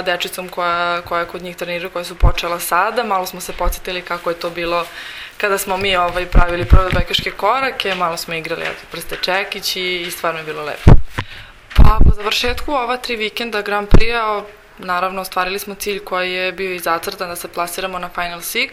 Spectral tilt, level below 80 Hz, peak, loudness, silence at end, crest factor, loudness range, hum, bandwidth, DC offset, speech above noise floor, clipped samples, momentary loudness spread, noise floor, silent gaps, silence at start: -4.5 dB/octave; -20 dBFS; 0 dBFS; -18 LUFS; 0 s; 16 dB; 4 LU; none; 16 kHz; under 0.1%; 19 dB; 0.3%; 10 LU; -35 dBFS; none; 0 s